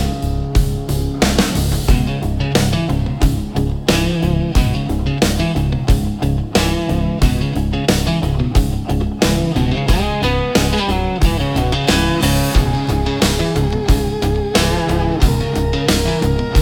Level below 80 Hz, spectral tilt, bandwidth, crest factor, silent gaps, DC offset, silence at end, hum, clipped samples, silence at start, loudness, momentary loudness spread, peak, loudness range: -20 dBFS; -5.5 dB/octave; 17.5 kHz; 14 dB; none; under 0.1%; 0 s; none; under 0.1%; 0 s; -17 LUFS; 4 LU; 0 dBFS; 1 LU